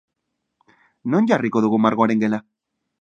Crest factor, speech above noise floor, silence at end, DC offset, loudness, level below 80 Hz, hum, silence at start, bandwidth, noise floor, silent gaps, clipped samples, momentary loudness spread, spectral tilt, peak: 20 dB; 59 dB; 0.6 s; under 0.1%; -19 LUFS; -68 dBFS; none; 1.05 s; 7.2 kHz; -77 dBFS; none; under 0.1%; 8 LU; -7.5 dB/octave; 0 dBFS